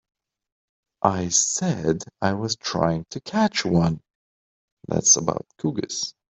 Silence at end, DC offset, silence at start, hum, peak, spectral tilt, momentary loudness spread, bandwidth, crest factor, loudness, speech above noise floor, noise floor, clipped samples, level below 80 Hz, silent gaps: 0.3 s; under 0.1%; 1.05 s; none; -4 dBFS; -3.5 dB/octave; 11 LU; 8.2 kHz; 22 dB; -22 LUFS; over 67 dB; under -90 dBFS; under 0.1%; -54 dBFS; 4.15-4.77 s